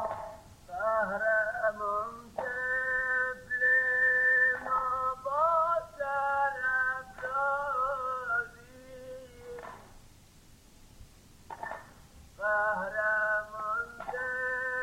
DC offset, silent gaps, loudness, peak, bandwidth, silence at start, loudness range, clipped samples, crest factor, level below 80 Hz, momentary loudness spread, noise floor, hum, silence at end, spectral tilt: under 0.1%; none; -29 LUFS; -16 dBFS; 16 kHz; 0 s; 15 LU; under 0.1%; 16 dB; -60 dBFS; 20 LU; -57 dBFS; none; 0 s; -4 dB/octave